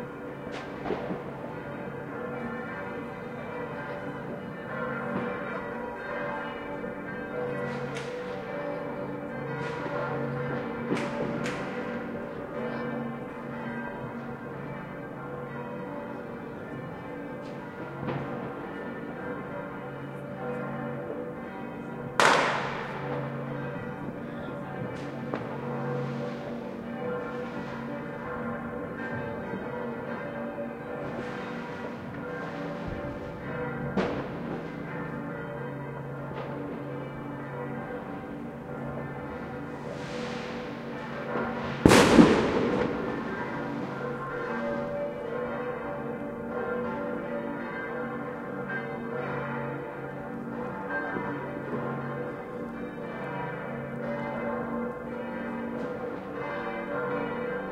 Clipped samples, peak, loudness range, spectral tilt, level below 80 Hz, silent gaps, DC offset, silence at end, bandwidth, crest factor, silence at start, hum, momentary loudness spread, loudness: under 0.1%; 0 dBFS; 11 LU; -5.5 dB/octave; -54 dBFS; none; under 0.1%; 0 s; 16 kHz; 32 dB; 0 s; none; 6 LU; -32 LUFS